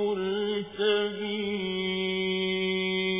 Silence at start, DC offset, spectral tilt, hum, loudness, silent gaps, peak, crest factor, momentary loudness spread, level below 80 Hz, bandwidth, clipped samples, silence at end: 0 s; under 0.1%; -3 dB/octave; none; -28 LUFS; none; -14 dBFS; 14 dB; 4 LU; -66 dBFS; 3.9 kHz; under 0.1%; 0 s